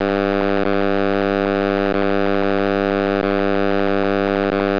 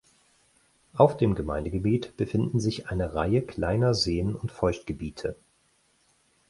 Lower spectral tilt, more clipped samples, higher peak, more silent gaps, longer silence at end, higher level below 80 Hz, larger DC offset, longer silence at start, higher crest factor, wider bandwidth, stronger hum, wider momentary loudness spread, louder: first, -8 dB/octave vs -6.5 dB/octave; neither; about the same, -6 dBFS vs -4 dBFS; neither; second, 0 s vs 1.15 s; second, -60 dBFS vs -44 dBFS; first, 2% vs under 0.1%; second, 0 s vs 0.95 s; second, 12 dB vs 24 dB; second, 5.4 kHz vs 11.5 kHz; neither; second, 0 LU vs 11 LU; first, -18 LUFS vs -27 LUFS